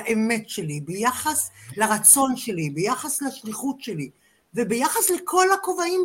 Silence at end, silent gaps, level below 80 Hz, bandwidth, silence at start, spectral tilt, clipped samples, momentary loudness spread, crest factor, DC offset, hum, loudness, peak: 0 s; none; -64 dBFS; 16.5 kHz; 0 s; -3 dB/octave; under 0.1%; 14 LU; 22 dB; under 0.1%; none; -21 LUFS; 0 dBFS